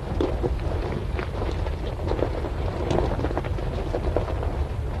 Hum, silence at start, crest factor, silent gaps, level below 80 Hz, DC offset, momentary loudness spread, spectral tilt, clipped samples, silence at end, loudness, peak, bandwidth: none; 0 s; 20 dB; none; -30 dBFS; under 0.1%; 4 LU; -7.5 dB/octave; under 0.1%; 0 s; -28 LUFS; -6 dBFS; 12 kHz